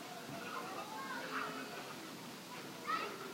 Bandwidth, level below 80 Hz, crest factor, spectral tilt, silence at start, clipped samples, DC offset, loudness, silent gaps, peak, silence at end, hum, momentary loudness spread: 16 kHz; -86 dBFS; 18 dB; -3 dB/octave; 0 s; under 0.1%; under 0.1%; -44 LUFS; none; -28 dBFS; 0 s; none; 8 LU